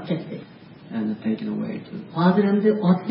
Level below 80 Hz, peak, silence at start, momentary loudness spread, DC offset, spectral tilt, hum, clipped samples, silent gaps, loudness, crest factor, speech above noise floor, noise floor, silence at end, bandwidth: -66 dBFS; -6 dBFS; 0 s; 15 LU; under 0.1%; -12.5 dB/octave; none; under 0.1%; none; -23 LUFS; 18 dB; 22 dB; -44 dBFS; 0 s; 5.4 kHz